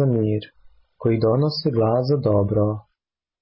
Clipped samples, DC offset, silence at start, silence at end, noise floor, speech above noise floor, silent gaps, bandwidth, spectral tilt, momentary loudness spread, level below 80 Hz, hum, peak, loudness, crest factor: under 0.1%; under 0.1%; 0 s; 0.6 s; -82 dBFS; 63 dB; none; 5.8 kHz; -12.5 dB/octave; 6 LU; -48 dBFS; none; -10 dBFS; -21 LUFS; 12 dB